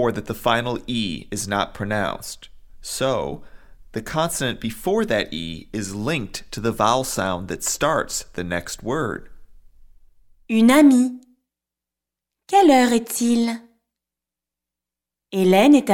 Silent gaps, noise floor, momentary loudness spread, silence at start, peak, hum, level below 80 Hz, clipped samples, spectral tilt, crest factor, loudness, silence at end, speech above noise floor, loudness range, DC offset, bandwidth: none; -87 dBFS; 16 LU; 0 s; -4 dBFS; none; -46 dBFS; under 0.1%; -4.5 dB/octave; 18 dB; -21 LUFS; 0 s; 67 dB; 8 LU; under 0.1%; 17.5 kHz